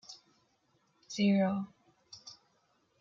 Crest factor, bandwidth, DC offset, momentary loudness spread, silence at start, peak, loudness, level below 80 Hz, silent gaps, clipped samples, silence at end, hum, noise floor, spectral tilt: 16 dB; 7.6 kHz; under 0.1%; 25 LU; 0.1 s; -20 dBFS; -31 LUFS; -82 dBFS; none; under 0.1%; 0.7 s; none; -74 dBFS; -6 dB/octave